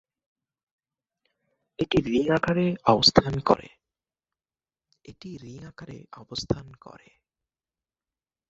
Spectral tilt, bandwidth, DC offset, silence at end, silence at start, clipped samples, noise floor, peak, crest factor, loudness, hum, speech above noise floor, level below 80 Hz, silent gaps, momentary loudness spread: -5 dB/octave; 8 kHz; under 0.1%; 1.8 s; 1.8 s; under 0.1%; under -90 dBFS; -2 dBFS; 26 dB; -23 LUFS; none; over 65 dB; -52 dBFS; none; 24 LU